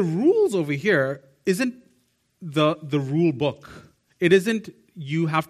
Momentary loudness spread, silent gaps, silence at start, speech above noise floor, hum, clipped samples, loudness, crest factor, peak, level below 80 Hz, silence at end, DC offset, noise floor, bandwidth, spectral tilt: 10 LU; none; 0 s; 45 dB; none; under 0.1%; -23 LUFS; 18 dB; -6 dBFS; -64 dBFS; 0.05 s; under 0.1%; -66 dBFS; 14.5 kHz; -6.5 dB/octave